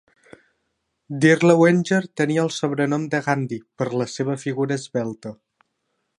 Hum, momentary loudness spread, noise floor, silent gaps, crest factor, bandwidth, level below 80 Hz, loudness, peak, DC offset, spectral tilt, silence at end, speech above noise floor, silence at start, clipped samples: none; 14 LU; -74 dBFS; none; 20 dB; 11 kHz; -68 dBFS; -21 LUFS; -2 dBFS; under 0.1%; -6 dB/octave; 0.85 s; 54 dB; 1.1 s; under 0.1%